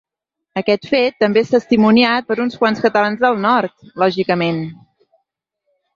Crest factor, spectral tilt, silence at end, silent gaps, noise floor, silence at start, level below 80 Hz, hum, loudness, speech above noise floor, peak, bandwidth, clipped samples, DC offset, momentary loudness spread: 16 dB; -6.5 dB/octave; 1.2 s; none; -80 dBFS; 0.55 s; -58 dBFS; none; -16 LUFS; 65 dB; -2 dBFS; 7.2 kHz; under 0.1%; under 0.1%; 9 LU